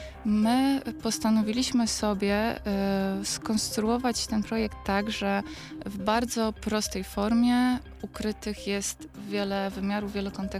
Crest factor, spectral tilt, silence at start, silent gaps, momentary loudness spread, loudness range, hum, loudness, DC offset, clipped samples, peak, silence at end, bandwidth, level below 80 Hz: 16 dB; -4.5 dB/octave; 0 s; none; 9 LU; 2 LU; none; -28 LUFS; under 0.1%; under 0.1%; -12 dBFS; 0 s; 15.5 kHz; -48 dBFS